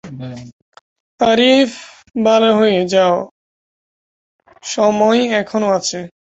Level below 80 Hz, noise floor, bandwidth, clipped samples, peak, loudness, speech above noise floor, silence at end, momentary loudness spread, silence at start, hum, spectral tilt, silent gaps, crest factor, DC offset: -58 dBFS; under -90 dBFS; 8.2 kHz; under 0.1%; -2 dBFS; -14 LUFS; over 76 dB; 0.25 s; 19 LU; 0.05 s; none; -4 dB/octave; 0.53-0.72 s, 0.81-1.18 s, 3.31-4.39 s; 14 dB; under 0.1%